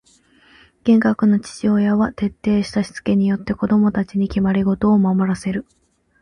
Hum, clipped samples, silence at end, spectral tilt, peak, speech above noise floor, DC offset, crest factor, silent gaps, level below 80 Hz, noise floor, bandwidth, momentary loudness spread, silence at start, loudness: none; under 0.1%; 0.6 s; -7.5 dB/octave; -6 dBFS; 36 dB; under 0.1%; 14 dB; none; -44 dBFS; -54 dBFS; 10.5 kHz; 7 LU; 0.85 s; -18 LUFS